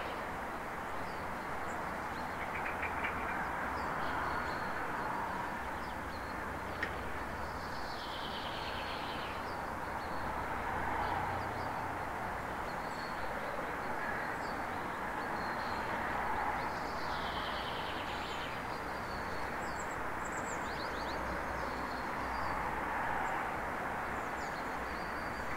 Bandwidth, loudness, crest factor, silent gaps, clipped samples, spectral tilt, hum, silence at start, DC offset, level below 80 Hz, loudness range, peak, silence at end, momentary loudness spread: 16 kHz; -38 LUFS; 18 dB; none; under 0.1%; -4.5 dB/octave; none; 0 s; 0.1%; -54 dBFS; 2 LU; -22 dBFS; 0 s; 4 LU